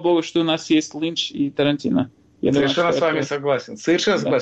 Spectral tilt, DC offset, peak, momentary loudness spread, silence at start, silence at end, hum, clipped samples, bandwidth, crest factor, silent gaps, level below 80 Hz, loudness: -5 dB/octave; under 0.1%; -8 dBFS; 5 LU; 0 s; 0 s; none; under 0.1%; 8.2 kHz; 12 dB; none; -58 dBFS; -20 LUFS